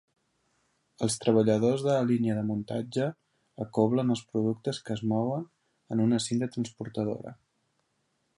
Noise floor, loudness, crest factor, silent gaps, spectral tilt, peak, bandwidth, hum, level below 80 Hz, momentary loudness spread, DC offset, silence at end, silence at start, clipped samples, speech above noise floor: -75 dBFS; -29 LUFS; 20 dB; none; -6.5 dB/octave; -10 dBFS; 11.5 kHz; none; -68 dBFS; 10 LU; under 0.1%; 1.05 s; 1 s; under 0.1%; 48 dB